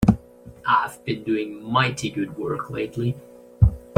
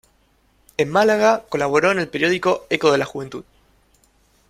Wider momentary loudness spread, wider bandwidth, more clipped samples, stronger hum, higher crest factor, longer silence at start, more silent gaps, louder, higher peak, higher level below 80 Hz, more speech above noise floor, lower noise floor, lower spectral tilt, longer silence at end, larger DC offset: second, 8 LU vs 15 LU; about the same, 15.5 kHz vs 15 kHz; neither; neither; about the same, 22 dB vs 18 dB; second, 0 s vs 0.8 s; neither; second, -24 LUFS vs -18 LUFS; about the same, -2 dBFS vs -2 dBFS; first, -34 dBFS vs -58 dBFS; second, 19 dB vs 42 dB; second, -44 dBFS vs -60 dBFS; first, -6.5 dB/octave vs -4.5 dB/octave; second, 0 s vs 1.1 s; neither